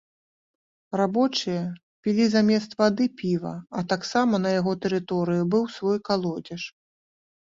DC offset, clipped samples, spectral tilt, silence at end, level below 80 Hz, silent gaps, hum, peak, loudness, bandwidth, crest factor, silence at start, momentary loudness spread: under 0.1%; under 0.1%; -6 dB/octave; 0.7 s; -66 dBFS; 1.83-2.03 s; none; -6 dBFS; -25 LUFS; 7.6 kHz; 18 dB; 0.9 s; 11 LU